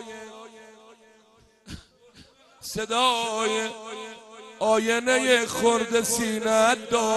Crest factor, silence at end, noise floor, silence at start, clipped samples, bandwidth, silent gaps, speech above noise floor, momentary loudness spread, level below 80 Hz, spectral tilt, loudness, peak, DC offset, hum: 18 dB; 0 s; -58 dBFS; 0 s; under 0.1%; 12.5 kHz; none; 35 dB; 23 LU; -60 dBFS; -2 dB/octave; -23 LUFS; -6 dBFS; under 0.1%; none